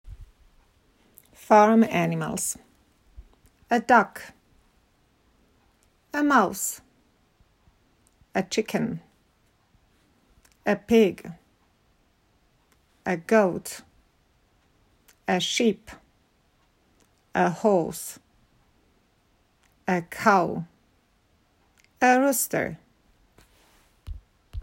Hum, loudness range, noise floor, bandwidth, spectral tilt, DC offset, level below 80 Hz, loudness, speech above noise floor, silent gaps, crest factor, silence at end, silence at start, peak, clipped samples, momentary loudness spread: none; 6 LU; -65 dBFS; 16 kHz; -4.5 dB/octave; under 0.1%; -54 dBFS; -24 LUFS; 43 dB; none; 22 dB; 0 s; 0.05 s; -4 dBFS; under 0.1%; 22 LU